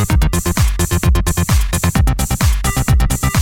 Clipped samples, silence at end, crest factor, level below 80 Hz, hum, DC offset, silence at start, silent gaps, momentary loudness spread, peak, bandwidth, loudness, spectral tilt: under 0.1%; 0 s; 10 dB; -16 dBFS; none; under 0.1%; 0 s; none; 1 LU; -4 dBFS; 17 kHz; -15 LUFS; -4.5 dB/octave